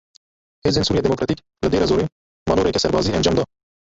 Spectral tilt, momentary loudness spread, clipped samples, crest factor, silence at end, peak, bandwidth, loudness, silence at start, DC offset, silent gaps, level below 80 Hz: -5.5 dB/octave; 7 LU; under 0.1%; 16 dB; 0.35 s; -4 dBFS; 8 kHz; -20 LUFS; 0.65 s; under 0.1%; 2.12-2.46 s; -38 dBFS